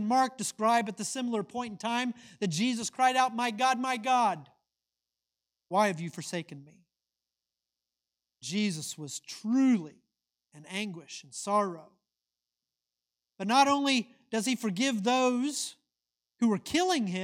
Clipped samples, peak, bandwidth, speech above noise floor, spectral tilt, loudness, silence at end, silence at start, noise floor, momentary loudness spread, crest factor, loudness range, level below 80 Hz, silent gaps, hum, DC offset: under 0.1%; -12 dBFS; 16 kHz; 60 dB; -3.5 dB/octave; -30 LUFS; 0 s; 0 s; -90 dBFS; 13 LU; 20 dB; 8 LU; -76 dBFS; none; none; under 0.1%